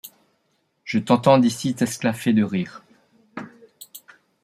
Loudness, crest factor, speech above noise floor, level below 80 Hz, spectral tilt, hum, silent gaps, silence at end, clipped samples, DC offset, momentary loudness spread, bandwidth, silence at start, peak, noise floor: -20 LUFS; 20 dB; 50 dB; -66 dBFS; -6 dB/octave; none; none; 0.45 s; under 0.1%; under 0.1%; 25 LU; 15.5 kHz; 0.05 s; -2 dBFS; -69 dBFS